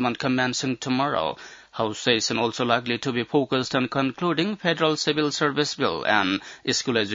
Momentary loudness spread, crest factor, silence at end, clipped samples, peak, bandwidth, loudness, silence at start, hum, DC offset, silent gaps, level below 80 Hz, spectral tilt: 5 LU; 20 dB; 0 s; under 0.1%; -4 dBFS; 7.8 kHz; -24 LUFS; 0 s; none; under 0.1%; none; -64 dBFS; -4 dB/octave